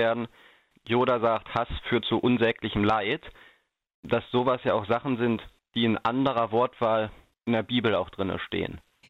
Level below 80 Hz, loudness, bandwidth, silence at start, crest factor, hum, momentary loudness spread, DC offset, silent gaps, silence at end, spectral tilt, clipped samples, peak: -52 dBFS; -27 LUFS; 6.6 kHz; 0 s; 18 dB; none; 8 LU; under 0.1%; 3.94-4.03 s; 0.3 s; -8 dB/octave; under 0.1%; -10 dBFS